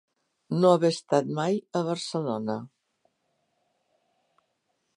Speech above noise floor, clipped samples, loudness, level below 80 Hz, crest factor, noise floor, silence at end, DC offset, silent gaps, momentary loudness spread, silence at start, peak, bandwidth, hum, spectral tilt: 51 dB; under 0.1%; -26 LUFS; -78 dBFS; 22 dB; -76 dBFS; 2.3 s; under 0.1%; none; 11 LU; 0.5 s; -8 dBFS; 11 kHz; none; -6 dB/octave